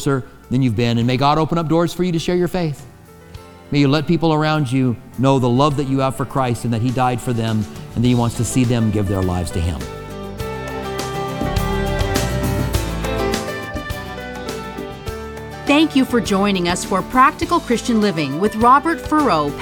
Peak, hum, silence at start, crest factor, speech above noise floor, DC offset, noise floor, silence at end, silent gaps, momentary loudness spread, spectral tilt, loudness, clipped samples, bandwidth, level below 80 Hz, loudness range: -2 dBFS; none; 0 s; 16 dB; 22 dB; under 0.1%; -39 dBFS; 0 s; none; 13 LU; -6 dB/octave; -18 LUFS; under 0.1%; 19 kHz; -34 dBFS; 6 LU